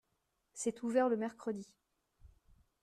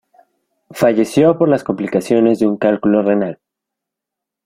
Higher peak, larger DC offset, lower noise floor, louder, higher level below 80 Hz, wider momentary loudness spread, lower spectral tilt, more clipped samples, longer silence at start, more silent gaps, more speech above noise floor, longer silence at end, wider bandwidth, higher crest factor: second, -20 dBFS vs 0 dBFS; neither; about the same, -82 dBFS vs -83 dBFS; second, -37 LUFS vs -15 LUFS; second, -72 dBFS vs -56 dBFS; first, 19 LU vs 6 LU; second, -5 dB/octave vs -7 dB/octave; neither; second, 0.55 s vs 0.7 s; neither; second, 47 dB vs 69 dB; second, 0.55 s vs 1.1 s; second, 13 kHz vs 16 kHz; about the same, 20 dB vs 16 dB